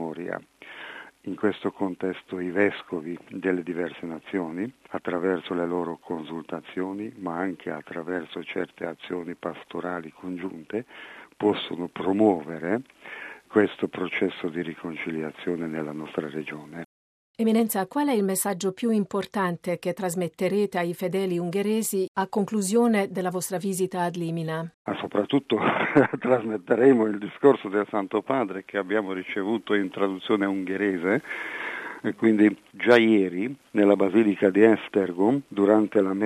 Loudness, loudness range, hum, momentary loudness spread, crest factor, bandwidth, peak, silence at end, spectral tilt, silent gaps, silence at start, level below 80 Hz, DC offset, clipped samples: -26 LUFS; 10 LU; none; 14 LU; 22 dB; 13.5 kHz; -4 dBFS; 0 s; -5.5 dB/octave; 16.86-17.34 s, 22.08-22.15 s, 24.74-24.85 s; 0 s; -72 dBFS; under 0.1%; under 0.1%